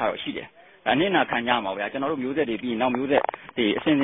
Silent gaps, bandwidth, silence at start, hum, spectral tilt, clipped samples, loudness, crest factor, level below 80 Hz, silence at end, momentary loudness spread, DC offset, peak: none; 4 kHz; 0 s; none; -9.5 dB/octave; under 0.1%; -25 LUFS; 18 dB; -60 dBFS; 0 s; 9 LU; under 0.1%; -6 dBFS